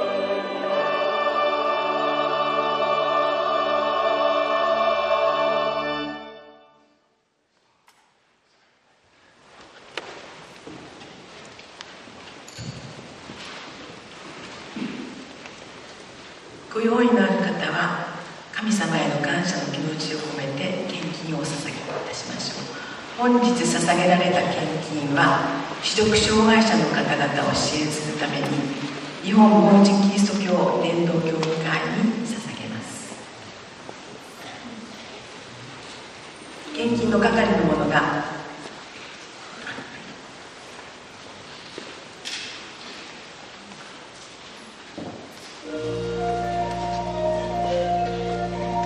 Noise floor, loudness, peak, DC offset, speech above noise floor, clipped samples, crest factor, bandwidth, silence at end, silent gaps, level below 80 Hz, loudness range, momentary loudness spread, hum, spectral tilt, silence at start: -68 dBFS; -22 LUFS; -2 dBFS; under 0.1%; 47 dB; under 0.1%; 22 dB; 11.5 kHz; 0 s; none; -52 dBFS; 19 LU; 21 LU; none; -5 dB/octave; 0 s